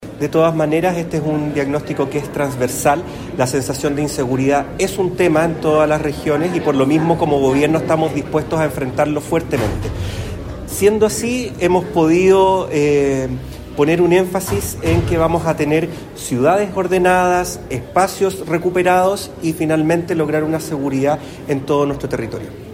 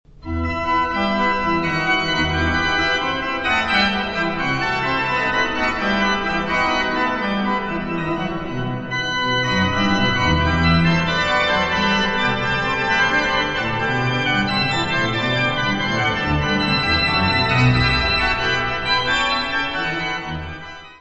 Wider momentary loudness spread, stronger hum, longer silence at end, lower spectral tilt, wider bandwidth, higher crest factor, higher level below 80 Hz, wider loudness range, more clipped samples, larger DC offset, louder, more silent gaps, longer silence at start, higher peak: about the same, 9 LU vs 7 LU; neither; about the same, 0 s vs 0.05 s; about the same, -6 dB/octave vs -5 dB/octave; first, 16.5 kHz vs 8.4 kHz; about the same, 14 dB vs 16 dB; about the same, -38 dBFS vs -36 dBFS; about the same, 3 LU vs 3 LU; neither; neither; about the same, -17 LUFS vs -18 LUFS; neither; second, 0 s vs 0.2 s; about the same, -2 dBFS vs -4 dBFS